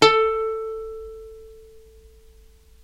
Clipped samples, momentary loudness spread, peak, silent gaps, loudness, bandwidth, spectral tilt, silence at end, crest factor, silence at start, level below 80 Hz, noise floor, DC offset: under 0.1%; 25 LU; 0 dBFS; none; -23 LUFS; 12.5 kHz; -3 dB/octave; 1.05 s; 24 dB; 0 s; -50 dBFS; -51 dBFS; under 0.1%